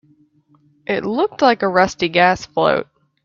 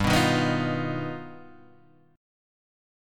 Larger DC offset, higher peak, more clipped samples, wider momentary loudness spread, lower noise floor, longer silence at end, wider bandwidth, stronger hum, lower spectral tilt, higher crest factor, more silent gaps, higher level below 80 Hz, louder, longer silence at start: neither; first, 0 dBFS vs -8 dBFS; neither; second, 8 LU vs 17 LU; about the same, -56 dBFS vs -58 dBFS; second, 0.4 s vs 1 s; second, 7.6 kHz vs 17.5 kHz; neither; about the same, -5 dB/octave vs -5.5 dB/octave; about the same, 18 dB vs 20 dB; neither; second, -54 dBFS vs -48 dBFS; first, -17 LUFS vs -26 LUFS; first, 0.9 s vs 0 s